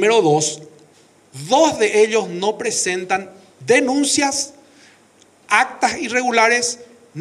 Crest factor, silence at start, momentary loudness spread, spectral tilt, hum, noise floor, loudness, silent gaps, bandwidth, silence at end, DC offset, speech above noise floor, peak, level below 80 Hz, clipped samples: 16 dB; 0 s; 11 LU; -2.5 dB/octave; none; -52 dBFS; -17 LUFS; none; 13 kHz; 0 s; under 0.1%; 35 dB; -2 dBFS; -64 dBFS; under 0.1%